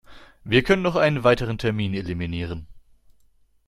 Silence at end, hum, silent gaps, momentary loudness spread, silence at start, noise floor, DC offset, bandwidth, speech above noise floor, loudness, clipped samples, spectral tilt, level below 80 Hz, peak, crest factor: 0.9 s; none; none; 13 LU; 0.1 s; -59 dBFS; under 0.1%; 13.5 kHz; 37 dB; -22 LUFS; under 0.1%; -6.5 dB/octave; -44 dBFS; -2 dBFS; 22 dB